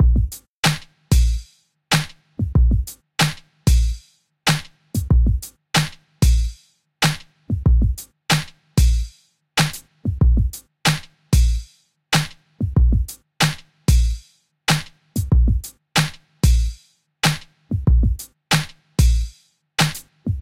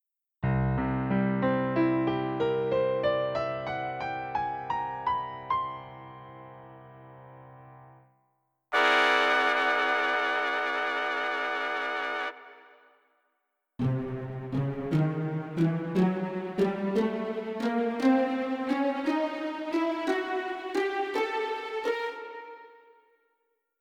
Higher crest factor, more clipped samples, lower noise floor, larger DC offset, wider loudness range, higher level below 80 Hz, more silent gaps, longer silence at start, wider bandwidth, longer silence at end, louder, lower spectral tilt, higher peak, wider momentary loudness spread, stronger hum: about the same, 18 dB vs 22 dB; neither; second, -50 dBFS vs -79 dBFS; neither; second, 1 LU vs 8 LU; first, -22 dBFS vs -54 dBFS; first, 0.48-0.63 s vs none; second, 0 s vs 0.4 s; first, 16.5 kHz vs 13 kHz; second, 0 s vs 1.1 s; first, -21 LUFS vs -28 LUFS; second, -4.5 dB/octave vs -6.5 dB/octave; first, -2 dBFS vs -8 dBFS; about the same, 10 LU vs 11 LU; neither